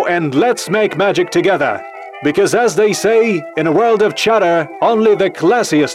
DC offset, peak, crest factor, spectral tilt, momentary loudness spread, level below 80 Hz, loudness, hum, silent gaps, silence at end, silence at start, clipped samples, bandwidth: under 0.1%; -2 dBFS; 12 dB; -4.5 dB/octave; 4 LU; -58 dBFS; -13 LUFS; none; none; 0 s; 0 s; under 0.1%; 15 kHz